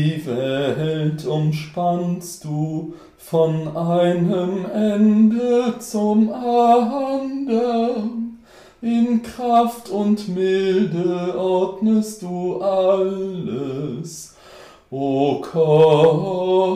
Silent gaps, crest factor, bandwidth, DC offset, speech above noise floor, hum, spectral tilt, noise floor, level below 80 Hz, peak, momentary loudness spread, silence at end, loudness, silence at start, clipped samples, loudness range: none; 16 dB; 15 kHz; under 0.1%; 26 dB; none; -7 dB/octave; -45 dBFS; -60 dBFS; -4 dBFS; 11 LU; 0 s; -19 LUFS; 0 s; under 0.1%; 5 LU